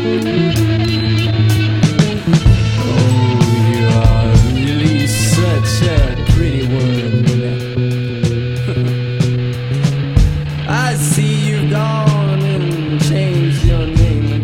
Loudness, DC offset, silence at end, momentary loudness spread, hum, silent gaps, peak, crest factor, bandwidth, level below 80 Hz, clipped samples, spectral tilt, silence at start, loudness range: -14 LUFS; under 0.1%; 0 s; 5 LU; none; none; 0 dBFS; 12 dB; 16 kHz; -22 dBFS; under 0.1%; -6 dB/octave; 0 s; 4 LU